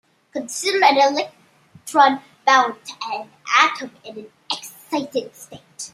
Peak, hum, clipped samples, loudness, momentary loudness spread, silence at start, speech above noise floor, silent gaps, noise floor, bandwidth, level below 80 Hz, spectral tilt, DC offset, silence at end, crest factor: 0 dBFS; none; under 0.1%; -19 LUFS; 21 LU; 0.35 s; 27 dB; none; -47 dBFS; 16 kHz; -74 dBFS; -1.5 dB/octave; under 0.1%; 0.05 s; 20 dB